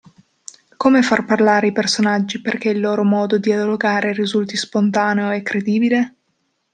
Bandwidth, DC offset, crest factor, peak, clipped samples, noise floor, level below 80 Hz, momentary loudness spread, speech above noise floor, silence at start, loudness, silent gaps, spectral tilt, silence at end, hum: 9.4 kHz; under 0.1%; 16 dB; -2 dBFS; under 0.1%; -68 dBFS; -64 dBFS; 6 LU; 52 dB; 0.8 s; -17 LUFS; none; -5 dB/octave; 0.65 s; none